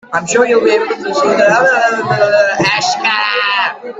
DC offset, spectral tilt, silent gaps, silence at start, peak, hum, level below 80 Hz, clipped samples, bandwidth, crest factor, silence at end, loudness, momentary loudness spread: under 0.1%; -3 dB/octave; none; 0.1 s; 0 dBFS; none; -56 dBFS; under 0.1%; 9 kHz; 12 dB; 0 s; -11 LUFS; 5 LU